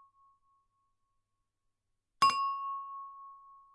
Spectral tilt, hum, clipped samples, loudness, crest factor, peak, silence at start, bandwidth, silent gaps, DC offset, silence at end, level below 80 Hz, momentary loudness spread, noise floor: -0.5 dB/octave; none; under 0.1%; -31 LUFS; 24 dB; -14 dBFS; 2.2 s; 11.5 kHz; none; under 0.1%; 0.2 s; -78 dBFS; 23 LU; -83 dBFS